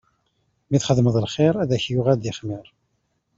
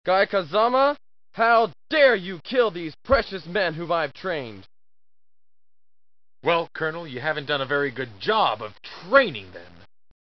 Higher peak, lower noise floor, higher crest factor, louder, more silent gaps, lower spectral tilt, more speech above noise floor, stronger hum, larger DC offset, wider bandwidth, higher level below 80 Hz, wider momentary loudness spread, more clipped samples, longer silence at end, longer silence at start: about the same, -4 dBFS vs -4 dBFS; second, -71 dBFS vs under -90 dBFS; about the same, 18 dB vs 20 dB; about the same, -21 LUFS vs -23 LUFS; neither; about the same, -6.5 dB/octave vs -6.5 dB/octave; second, 51 dB vs over 67 dB; neither; second, under 0.1% vs 0.3%; first, 7.8 kHz vs 6 kHz; about the same, -54 dBFS vs -50 dBFS; about the same, 12 LU vs 14 LU; neither; about the same, 0.75 s vs 0.65 s; first, 0.7 s vs 0.05 s